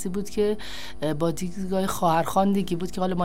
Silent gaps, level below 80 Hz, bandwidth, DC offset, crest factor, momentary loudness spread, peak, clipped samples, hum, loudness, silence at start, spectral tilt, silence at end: none; -46 dBFS; 16 kHz; 3%; 16 dB; 9 LU; -8 dBFS; under 0.1%; 50 Hz at -50 dBFS; -26 LUFS; 0 s; -6 dB/octave; 0 s